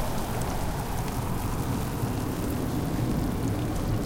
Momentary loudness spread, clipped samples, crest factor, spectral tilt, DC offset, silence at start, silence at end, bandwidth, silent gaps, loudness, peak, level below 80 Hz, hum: 3 LU; under 0.1%; 12 dB; -6 dB/octave; under 0.1%; 0 s; 0 s; 17 kHz; none; -30 LUFS; -16 dBFS; -36 dBFS; none